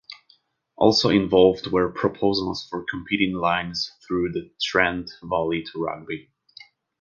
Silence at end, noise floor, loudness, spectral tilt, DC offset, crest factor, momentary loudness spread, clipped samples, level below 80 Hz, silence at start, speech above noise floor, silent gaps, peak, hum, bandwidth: 0.8 s; -61 dBFS; -23 LUFS; -5 dB/octave; under 0.1%; 22 dB; 13 LU; under 0.1%; -52 dBFS; 0.1 s; 39 dB; none; -2 dBFS; none; 7.4 kHz